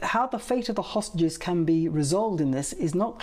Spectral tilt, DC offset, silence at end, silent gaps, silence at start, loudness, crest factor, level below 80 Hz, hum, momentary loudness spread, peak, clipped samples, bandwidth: -5.5 dB/octave; under 0.1%; 0 s; none; 0 s; -26 LUFS; 12 dB; -50 dBFS; none; 4 LU; -14 dBFS; under 0.1%; 15 kHz